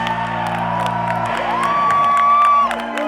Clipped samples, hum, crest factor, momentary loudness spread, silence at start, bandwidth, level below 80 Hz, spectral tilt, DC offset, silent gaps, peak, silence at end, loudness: under 0.1%; none; 16 dB; 8 LU; 0 s; 13.5 kHz; -46 dBFS; -5 dB/octave; under 0.1%; none; -2 dBFS; 0 s; -16 LUFS